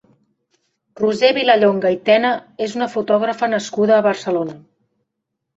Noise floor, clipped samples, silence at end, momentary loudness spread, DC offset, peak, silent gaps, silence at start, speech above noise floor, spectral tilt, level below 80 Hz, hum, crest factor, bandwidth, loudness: -78 dBFS; under 0.1%; 1 s; 9 LU; under 0.1%; -2 dBFS; none; 1 s; 61 dB; -5 dB/octave; -64 dBFS; none; 16 dB; 8 kHz; -17 LUFS